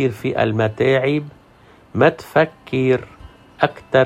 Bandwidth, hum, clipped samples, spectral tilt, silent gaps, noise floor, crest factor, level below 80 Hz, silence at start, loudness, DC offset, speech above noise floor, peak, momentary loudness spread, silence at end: 14.5 kHz; none; under 0.1%; -7.5 dB/octave; none; -48 dBFS; 18 dB; -52 dBFS; 0 s; -19 LUFS; under 0.1%; 31 dB; -2 dBFS; 5 LU; 0 s